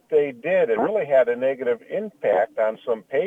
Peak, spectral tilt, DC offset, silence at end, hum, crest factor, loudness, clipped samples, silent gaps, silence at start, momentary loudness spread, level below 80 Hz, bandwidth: -8 dBFS; -7.5 dB/octave; under 0.1%; 0 s; none; 14 dB; -22 LUFS; under 0.1%; none; 0.1 s; 7 LU; -68 dBFS; 3.8 kHz